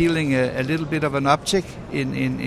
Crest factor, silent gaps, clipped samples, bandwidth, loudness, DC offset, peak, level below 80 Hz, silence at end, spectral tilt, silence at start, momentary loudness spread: 18 dB; none; under 0.1%; 14.5 kHz; -22 LUFS; under 0.1%; -4 dBFS; -46 dBFS; 0 s; -5.5 dB/octave; 0 s; 6 LU